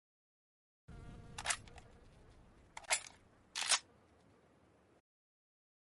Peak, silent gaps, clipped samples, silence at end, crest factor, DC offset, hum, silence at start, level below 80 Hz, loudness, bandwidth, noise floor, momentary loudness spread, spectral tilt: -18 dBFS; none; under 0.1%; 2.15 s; 30 dB; under 0.1%; none; 0.9 s; -66 dBFS; -38 LUFS; 11.5 kHz; -69 dBFS; 24 LU; 0.5 dB/octave